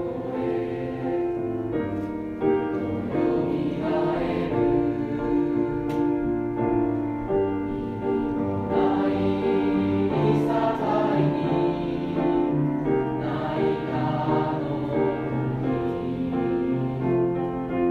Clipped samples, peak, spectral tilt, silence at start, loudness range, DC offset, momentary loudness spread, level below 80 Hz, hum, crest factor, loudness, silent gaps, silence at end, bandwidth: under 0.1%; -10 dBFS; -9.5 dB/octave; 0 s; 3 LU; under 0.1%; 5 LU; -46 dBFS; none; 14 dB; -25 LUFS; none; 0 s; 6.4 kHz